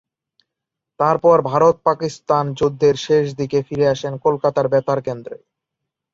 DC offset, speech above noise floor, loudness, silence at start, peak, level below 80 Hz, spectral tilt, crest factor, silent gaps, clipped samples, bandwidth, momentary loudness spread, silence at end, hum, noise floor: under 0.1%; 66 dB; -18 LUFS; 1 s; -2 dBFS; -56 dBFS; -6.5 dB/octave; 16 dB; none; under 0.1%; 7.8 kHz; 8 LU; 0.8 s; none; -83 dBFS